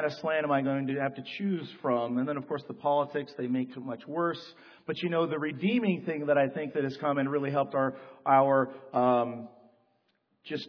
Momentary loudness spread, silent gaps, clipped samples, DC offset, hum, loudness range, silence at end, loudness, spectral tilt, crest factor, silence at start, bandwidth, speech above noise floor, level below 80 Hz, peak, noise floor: 11 LU; none; under 0.1%; under 0.1%; none; 4 LU; 0 s; -30 LUFS; -8 dB/octave; 20 dB; 0 s; 5.4 kHz; 45 dB; -80 dBFS; -10 dBFS; -74 dBFS